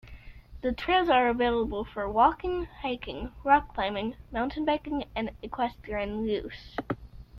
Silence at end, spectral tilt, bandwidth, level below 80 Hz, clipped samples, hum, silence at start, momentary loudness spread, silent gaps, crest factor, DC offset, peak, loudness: 0 s; -7 dB/octave; 11.5 kHz; -46 dBFS; under 0.1%; none; 0.05 s; 12 LU; none; 20 dB; under 0.1%; -8 dBFS; -29 LUFS